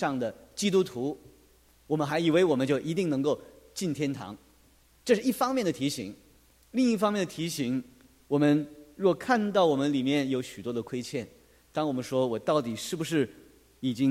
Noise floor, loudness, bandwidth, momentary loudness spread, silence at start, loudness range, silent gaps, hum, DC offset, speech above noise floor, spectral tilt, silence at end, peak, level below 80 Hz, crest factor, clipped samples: -61 dBFS; -29 LUFS; 16 kHz; 12 LU; 0 s; 4 LU; none; none; under 0.1%; 34 dB; -5.5 dB/octave; 0 s; -10 dBFS; -64 dBFS; 20 dB; under 0.1%